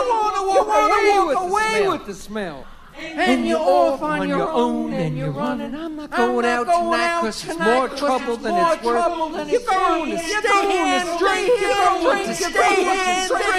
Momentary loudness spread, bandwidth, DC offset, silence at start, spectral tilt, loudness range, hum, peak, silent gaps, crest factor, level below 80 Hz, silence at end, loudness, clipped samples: 9 LU; 15 kHz; under 0.1%; 0 s; -4 dB/octave; 3 LU; none; -4 dBFS; none; 16 dB; -44 dBFS; 0 s; -19 LUFS; under 0.1%